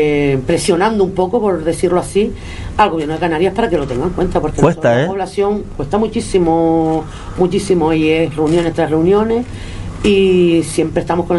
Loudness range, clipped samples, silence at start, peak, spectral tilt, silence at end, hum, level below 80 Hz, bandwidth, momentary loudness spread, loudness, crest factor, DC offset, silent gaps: 2 LU; under 0.1%; 0 s; 0 dBFS; -6 dB/octave; 0 s; none; -32 dBFS; 11.5 kHz; 6 LU; -15 LUFS; 14 dB; under 0.1%; none